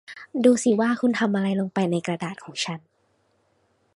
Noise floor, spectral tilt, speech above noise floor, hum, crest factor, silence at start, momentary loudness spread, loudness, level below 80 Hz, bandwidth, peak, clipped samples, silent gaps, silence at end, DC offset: -67 dBFS; -5.5 dB/octave; 45 dB; none; 20 dB; 0.1 s; 12 LU; -23 LUFS; -70 dBFS; 11.5 kHz; -6 dBFS; under 0.1%; none; 1.15 s; under 0.1%